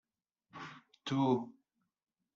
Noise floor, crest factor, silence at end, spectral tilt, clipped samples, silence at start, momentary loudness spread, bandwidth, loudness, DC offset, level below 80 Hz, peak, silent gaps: -81 dBFS; 22 dB; 0.85 s; -6 dB/octave; under 0.1%; 0.55 s; 19 LU; 7.4 kHz; -35 LUFS; under 0.1%; -80 dBFS; -18 dBFS; none